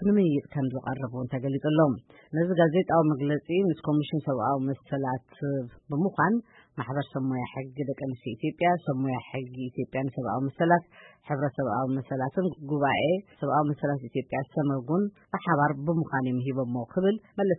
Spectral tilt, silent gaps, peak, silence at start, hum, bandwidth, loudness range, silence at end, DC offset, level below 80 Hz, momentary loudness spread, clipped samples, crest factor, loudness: -11.5 dB/octave; none; -10 dBFS; 0 s; none; 4 kHz; 5 LU; 0 s; under 0.1%; -64 dBFS; 9 LU; under 0.1%; 18 dB; -28 LUFS